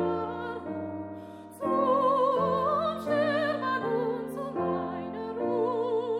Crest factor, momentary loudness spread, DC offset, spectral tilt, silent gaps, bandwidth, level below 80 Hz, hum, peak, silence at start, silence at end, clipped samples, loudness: 14 dB; 11 LU; under 0.1%; -7 dB/octave; none; 14.5 kHz; -66 dBFS; none; -14 dBFS; 0 s; 0 s; under 0.1%; -29 LUFS